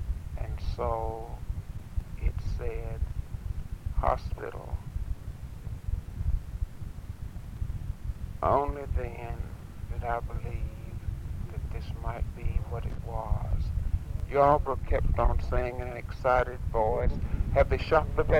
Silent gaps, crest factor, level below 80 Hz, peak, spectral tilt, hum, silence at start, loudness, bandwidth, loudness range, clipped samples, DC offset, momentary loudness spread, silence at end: none; 22 dB; -34 dBFS; -8 dBFS; -8 dB/octave; none; 0 s; -32 LUFS; 15.5 kHz; 9 LU; under 0.1%; 0.2%; 13 LU; 0 s